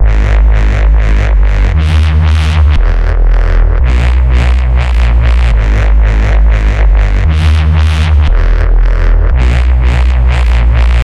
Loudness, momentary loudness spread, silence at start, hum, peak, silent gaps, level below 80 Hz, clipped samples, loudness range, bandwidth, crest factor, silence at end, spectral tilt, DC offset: -10 LUFS; 2 LU; 0 s; none; 0 dBFS; none; -6 dBFS; under 0.1%; 0 LU; 7.2 kHz; 6 dB; 0 s; -7 dB/octave; 0.8%